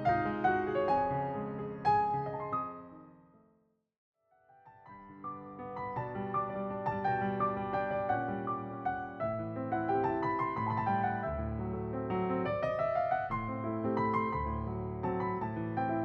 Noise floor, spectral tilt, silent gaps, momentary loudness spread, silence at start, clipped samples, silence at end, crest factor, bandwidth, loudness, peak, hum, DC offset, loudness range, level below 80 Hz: -72 dBFS; -9.5 dB/octave; 3.98-4.13 s; 9 LU; 0 s; under 0.1%; 0 s; 18 dB; 6.6 kHz; -34 LUFS; -18 dBFS; none; under 0.1%; 9 LU; -54 dBFS